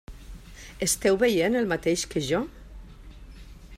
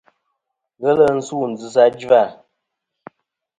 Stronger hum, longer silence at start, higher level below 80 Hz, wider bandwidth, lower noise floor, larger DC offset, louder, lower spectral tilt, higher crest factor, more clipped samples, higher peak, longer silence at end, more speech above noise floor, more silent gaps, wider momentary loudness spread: neither; second, 0.1 s vs 0.8 s; first, -46 dBFS vs -62 dBFS; first, 16 kHz vs 9.4 kHz; second, -45 dBFS vs -78 dBFS; neither; second, -25 LUFS vs -17 LUFS; second, -4 dB/octave vs -5.5 dB/octave; about the same, 18 dB vs 18 dB; neither; second, -10 dBFS vs 0 dBFS; second, 0 s vs 1.25 s; second, 20 dB vs 62 dB; neither; first, 24 LU vs 10 LU